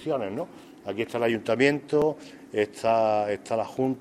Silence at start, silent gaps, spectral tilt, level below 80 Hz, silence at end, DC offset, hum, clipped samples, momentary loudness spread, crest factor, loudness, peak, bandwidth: 0 s; none; -6 dB/octave; -66 dBFS; 0 s; under 0.1%; none; under 0.1%; 13 LU; 20 dB; -26 LUFS; -6 dBFS; 14 kHz